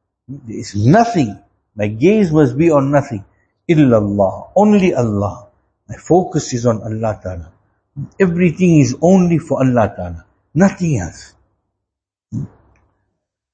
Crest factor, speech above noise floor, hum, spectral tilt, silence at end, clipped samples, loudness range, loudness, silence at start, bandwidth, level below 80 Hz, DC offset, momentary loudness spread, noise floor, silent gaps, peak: 16 dB; 67 dB; none; -7.5 dB/octave; 1.05 s; under 0.1%; 6 LU; -14 LUFS; 0.3 s; 8.6 kHz; -44 dBFS; under 0.1%; 18 LU; -81 dBFS; none; 0 dBFS